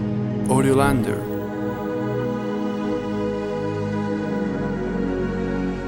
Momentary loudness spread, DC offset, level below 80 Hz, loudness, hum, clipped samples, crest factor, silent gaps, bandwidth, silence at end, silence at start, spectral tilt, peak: 8 LU; under 0.1%; -40 dBFS; -23 LUFS; none; under 0.1%; 18 dB; none; 17 kHz; 0 s; 0 s; -7 dB/octave; -4 dBFS